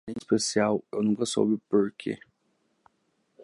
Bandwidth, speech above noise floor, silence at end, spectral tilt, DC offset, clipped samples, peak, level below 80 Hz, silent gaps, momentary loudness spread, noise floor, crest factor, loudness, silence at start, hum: 11.5 kHz; 46 dB; 0 s; -4.5 dB/octave; under 0.1%; under 0.1%; -10 dBFS; -68 dBFS; none; 10 LU; -73 dBFS; 18 dB; -27 LUFS; 0.05 s; none